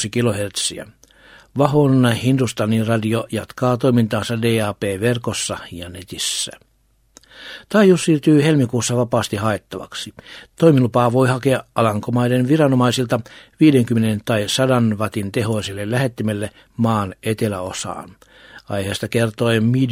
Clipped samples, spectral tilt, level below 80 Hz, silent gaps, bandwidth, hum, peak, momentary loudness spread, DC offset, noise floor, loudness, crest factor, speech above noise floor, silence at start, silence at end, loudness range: under 0.1%; -5.5 dB/octave; -54 dBFS; none; 16 kHz; none; 0 dBFS; 14 LU; under 0.1%; -60 dBFS; -18 LUFS; 18 dB; 42 dB; 0 s; 0 s; 6 LU